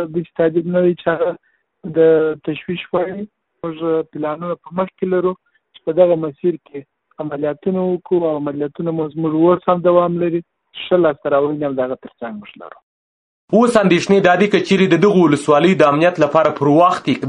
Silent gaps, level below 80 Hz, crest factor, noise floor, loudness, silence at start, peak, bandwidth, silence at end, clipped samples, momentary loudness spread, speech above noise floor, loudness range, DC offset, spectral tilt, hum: 12.83-13.48 s; -58 dBFS; 16 dB; under -90 dBFS; -16 LUFS; 0 s; 0 dBFS; 10.5 kHz; 0 s; under 0.1%; 17 LU; over 74 dB; 8 LU; under 0.1%; -7 dB/octave; none